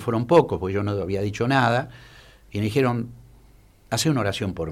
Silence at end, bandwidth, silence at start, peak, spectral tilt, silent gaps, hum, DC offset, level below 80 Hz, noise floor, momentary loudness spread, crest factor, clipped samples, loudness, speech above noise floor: 0 s; 15.5 kHz; 0 s; -6 dBFS; -5.5 dB/octave; none; none; under 0.1%; -50 dBFS; -53 dBFS; 11 LU; 18 dB; under 0.1%; -23 LUFS; 30 dB